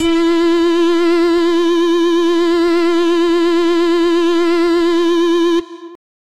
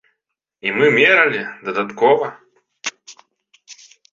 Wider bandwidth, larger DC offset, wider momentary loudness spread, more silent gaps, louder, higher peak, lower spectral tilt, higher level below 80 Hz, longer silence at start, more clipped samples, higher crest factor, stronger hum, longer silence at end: first, 10 kHz vs 7.6 kHz; neither; second, 1 LU vs 17 LU; neither; first, -13 LUFS vs -16 LUFS; about the same, -4 dBFS vs -2 dBFS; about the same, -3.5 dB/octave vs -4 dB/octave; first, -46 dBFS vs -66 dBFS; second, 0 s vs 0.65 s; neither; second, 8 dB vs 18 dB; neither; about the same, 0.4 s vs 0.4 s